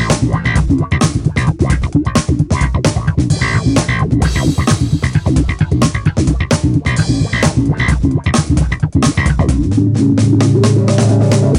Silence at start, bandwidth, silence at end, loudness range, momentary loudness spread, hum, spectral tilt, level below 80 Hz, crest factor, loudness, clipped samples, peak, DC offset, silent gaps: 0 s; 11.5 kHz; 0 s; 2 LU; 4 LU; none; -6 dB/octave; -22 dBFS; 12 dB; -13 LUFS; under 0.1%; 0 dBFS; under 0.1%; none